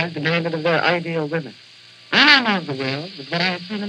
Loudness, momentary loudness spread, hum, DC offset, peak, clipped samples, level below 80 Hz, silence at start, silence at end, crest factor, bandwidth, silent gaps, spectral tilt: -18 LUFS; 15 LU; none; under 0.1%; 0 dBFS; under 0.1%; -78 dBFS; 0 s; 0 s; 20 dB; 10 kHz; none; -5 dB/octave